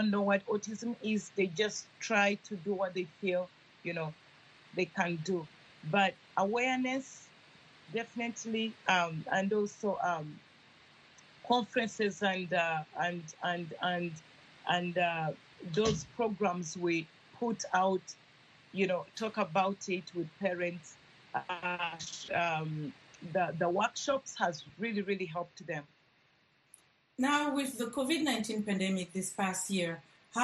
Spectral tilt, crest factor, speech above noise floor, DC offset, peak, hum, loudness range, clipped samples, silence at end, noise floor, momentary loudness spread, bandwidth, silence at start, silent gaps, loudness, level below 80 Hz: -4.5 dB/octave; 20 dB; 36 dB; under 0.1%; -14 dBFS; none; 3 LU; under 0.1%; 0 s; -69 dBFS; 11 LU; 12 kHz; 0 s; none; -34 LUFS; -70 dBFS